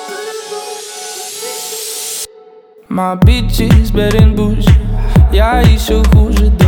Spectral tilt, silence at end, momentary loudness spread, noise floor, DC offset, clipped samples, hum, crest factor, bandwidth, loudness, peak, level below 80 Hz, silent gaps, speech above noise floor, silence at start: -6 dB/octave; 0 s; 13 LU; -40 dBFS; under 0.1%; under 0.1%; none; 10 dB; 18 kHz; -12 LUFS; 0 dBFS; -14 dBFS; none; 32 dB; 0 s